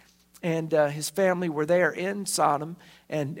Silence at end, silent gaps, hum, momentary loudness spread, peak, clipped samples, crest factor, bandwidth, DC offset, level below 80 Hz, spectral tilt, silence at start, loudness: 0 s; none; none; 11 LU; -10 dBFS; under 0.1%; 18 dB; 16.5 kHz; under 0.1%; -70 dBFS; -4.5 dB/octave; 0.45 s; -26 LUFS